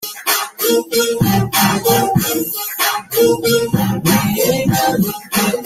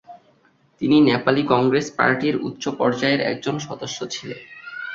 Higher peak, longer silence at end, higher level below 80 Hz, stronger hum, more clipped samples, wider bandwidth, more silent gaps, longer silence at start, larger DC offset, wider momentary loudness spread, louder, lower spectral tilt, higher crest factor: about the same, -2 dBFS vs -2 dBFS; about the same, 0 s vs 0 s; first, -46 dBFS vs -60 dBFS; neither; neither; first, 16.5 kHz vs 7.6 kHz; neither; about the same, 0 s vs 0.1 s; neither; second, 4 LU vs 14 LU; first, -15 LUFS vs -20 LUFS; about the same, -4 dB/octave vs -5 dB/octave; second, 14 dB vs 20 dB